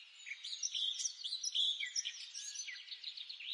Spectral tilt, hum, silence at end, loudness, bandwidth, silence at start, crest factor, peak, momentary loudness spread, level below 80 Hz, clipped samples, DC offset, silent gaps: 10.5 dB/octave; none; 0 s; -39 LUFS; 11.5 kHz; 0 s; 18 dB; -24 dBFS; 12 LU; under -90 dBFS; under 0.1%; under 0.1%; none